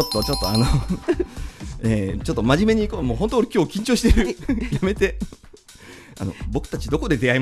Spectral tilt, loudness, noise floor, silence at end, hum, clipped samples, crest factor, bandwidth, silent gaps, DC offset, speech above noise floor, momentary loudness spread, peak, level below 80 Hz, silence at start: -5.5 dB/octave; -22 LUFS; -45 dBFS; 0 s; none; under 0.1%; 20 dB; 14.5 kHz; none; under 0.1%; 25 dB; 14 LU; -2 dBFS; -30 dBFS; 0 s